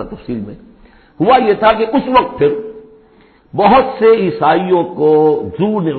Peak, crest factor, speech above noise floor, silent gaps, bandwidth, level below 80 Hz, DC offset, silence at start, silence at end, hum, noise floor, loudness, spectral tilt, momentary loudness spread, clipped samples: 0 dBFS; 14 dB; 35 dB; none; 4.5 kHz; -44 dBFS; under 0.1%; 0 s; 0 s; none; -47 dBFS; -12 LUFS; -10.5 dB/octave; 14 LU; under 0.1%